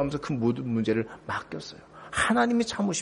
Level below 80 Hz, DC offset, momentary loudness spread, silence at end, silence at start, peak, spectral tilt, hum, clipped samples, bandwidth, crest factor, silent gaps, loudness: -54 dBFS; under 0.1%; 16 LU; 0 s; 0 s; -10 dBFS; -5 dB/octave; none; under 0.1%; 10.5 kHz; 16 dB; none; -27 LUFS